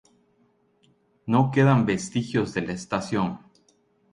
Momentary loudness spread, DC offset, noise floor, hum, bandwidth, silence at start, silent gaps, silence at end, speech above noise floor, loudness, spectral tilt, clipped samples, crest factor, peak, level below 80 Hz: 11 LU; under 0.1%; -65 dBFS; none; 11 kHz; 1.25 s; none; 0.75 s; 42 dB; -24 LUFS; -6.5 dB/octave; under 0.1%; 20 dB; -6 dBFS; -56 dBFS